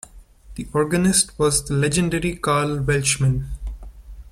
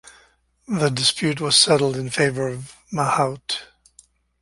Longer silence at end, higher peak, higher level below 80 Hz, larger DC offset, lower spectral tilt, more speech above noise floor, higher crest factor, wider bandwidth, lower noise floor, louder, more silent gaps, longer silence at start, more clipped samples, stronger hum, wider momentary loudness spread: second, 0 s vs 0.8 s; about the same, -4 dBFS vs -2 dBFS; first, -36 dBFS vs -56 dBFS; neither; about the same, -4.5 dB/octave vs -3.5 dB/octave; second, 23 dB vs 37 dB; about the same, 18 dB vs 20 dB; first, 15.5 kHz vs 11.5 kHz; second, -43 dBFS vs -58 dBFS; about the same, -20 LUFS vs -20 LUFS; neither; second, 0.15 s vs 0.7 s; neither; neither; first, 18 LU vs 13 LU